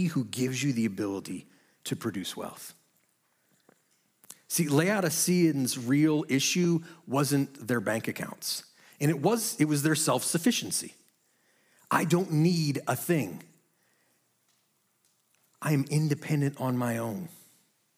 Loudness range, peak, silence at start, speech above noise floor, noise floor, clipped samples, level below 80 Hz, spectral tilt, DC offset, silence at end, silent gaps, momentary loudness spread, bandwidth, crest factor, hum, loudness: 8 LU; -8 dBFS; 0 s; 45 dB; -72 dBFS; under 0.1%; -78 dBFS; -4.5 dB/octave; under 0.1%; 0.6 s; none; 12 LU; 16.5 kHz; 20 dB; none; -28 LUFS